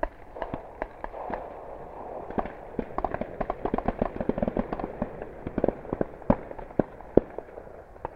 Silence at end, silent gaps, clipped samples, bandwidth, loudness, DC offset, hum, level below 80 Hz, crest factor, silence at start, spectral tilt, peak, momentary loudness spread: 0 s; none; under 0.1%; 6.2 kHz; -32 LUFS; under 0.1%; none; -42 dBFS; 30 dB; 0 s; -10 dB/octave; 0 dBFS; 14 LU